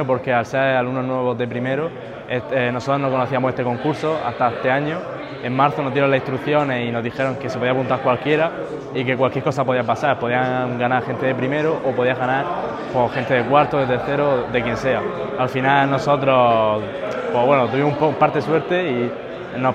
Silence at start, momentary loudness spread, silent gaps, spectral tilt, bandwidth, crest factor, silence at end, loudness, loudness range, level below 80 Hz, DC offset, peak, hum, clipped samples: 0 s; 8 LU; none; -7 dB/octave; 9.6 kHz; 18 dB; 0 s; -20 LUFS; 3 LU; -52 dBFS; under 0.1%; 0 dBFS; none; under 0.1%